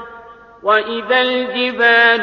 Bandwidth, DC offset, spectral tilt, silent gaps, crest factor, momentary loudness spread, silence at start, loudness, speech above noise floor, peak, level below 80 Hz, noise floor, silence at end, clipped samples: 6.6 kHz; under 0.1%; -4.5 dB/octave; none; 14 dB; 8 LU; 0 s; -14 LUFS; 25 dB; -2 dBFS; -58 dBFS; -39 dBFS; 0 s; under 0.1%